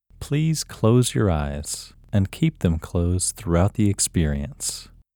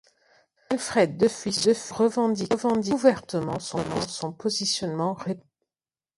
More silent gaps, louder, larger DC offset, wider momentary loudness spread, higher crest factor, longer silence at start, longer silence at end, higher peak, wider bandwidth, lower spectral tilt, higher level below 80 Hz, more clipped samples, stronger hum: neither; about the same, -23 LUFS vs -25 LUFS; neither; about the same, 9 LU vs 8 LU; about the same, 18 dB vs 20 dB; second, 0.2 s vs 0.7 s; second, 0.3 s vs 0.75 s; about the same, -4 dBFS vs -6 dBFS; first, 19.5 kHz vs 11.5 kHz; about the same, -5.5 dB/octave vs -4.5 dB/octave; first, -36 dBFS vs -60 dBFS; neither; neither